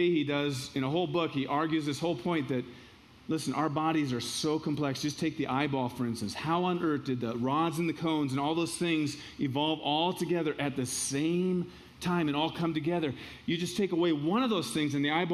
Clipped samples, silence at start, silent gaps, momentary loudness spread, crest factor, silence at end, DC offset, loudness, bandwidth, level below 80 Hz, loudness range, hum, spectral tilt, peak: under 0.1%; 0 s; none; 5 LU; 18 dB; 0 s; under 0.1%; -31 LUFS; 14 kHz; -64 dBFS; 2 LU; none; -5 dB/octave; -14 dBFS